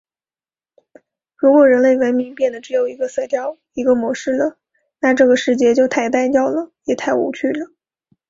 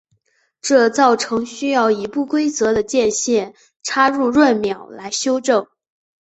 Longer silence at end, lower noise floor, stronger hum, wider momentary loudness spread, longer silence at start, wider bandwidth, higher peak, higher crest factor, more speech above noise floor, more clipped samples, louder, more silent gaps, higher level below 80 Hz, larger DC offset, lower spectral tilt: about the same, 0.65 s vs 0.55 s; first, under -90 dBFS vs -64 dBFS; neither; about the same, 11 LU vs 10 LU; first, 1.4 s vs 0.65 s; about the same, 7.8 kHz vs 8.2 kHz; about the same, -2 dBFS vs -2 dBFS; about the same, 16 dB vs 16 dB; first, over 74 dB vs 47 dB; neither; about the same, -17 LUFS vs -17 LUFS; second, none vs 3.76-3.80 s; about the same, -60 dBFS vs -56 dBFS; neither; first, -4.5 dB/octave vs -3 dB/octave